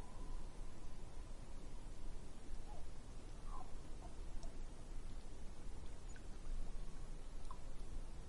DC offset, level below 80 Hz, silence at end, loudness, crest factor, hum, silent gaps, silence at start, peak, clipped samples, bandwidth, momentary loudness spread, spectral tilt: under 0.1%; -48 dBFS; 0 s; -56 LUFS; 12 dB; none; none; 0 s; -32 dBFS; under 0.1%; 11.5 kHz; 2 LU; -5 dB/octave